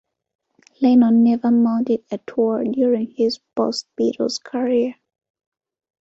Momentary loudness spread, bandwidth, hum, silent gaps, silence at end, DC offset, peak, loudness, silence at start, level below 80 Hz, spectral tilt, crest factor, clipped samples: 9 LU; 8 kHz; none; none; 1.1 s; under 0.1%; -6 dBFS; -19 LUFS; 0.8 s; -64 dBFS; -6 dB/octave; 14 dB; under 0.1%